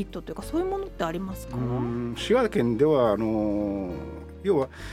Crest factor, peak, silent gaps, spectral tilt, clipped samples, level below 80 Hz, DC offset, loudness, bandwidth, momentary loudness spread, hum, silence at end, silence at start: 18 dB; -8 dBFS; none; -7 dB/octave; under 0.1%; -44 dBFS; under 0.1%; -26 LUFS; 15.5 kHz; 12 LU; none; 0 s; 0 s